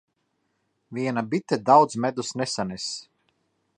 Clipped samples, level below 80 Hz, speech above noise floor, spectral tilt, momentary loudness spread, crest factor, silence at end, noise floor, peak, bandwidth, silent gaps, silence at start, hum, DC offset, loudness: under 0.1%; -66 dBFS; 50 dB; -4.5 dB/octave; 14 LU; 22 dB; 0.75 s; -74 dBFS; -4 dBFS; 11 kHz; none; 0.9 s; none; under 0.1%; -24 LUFS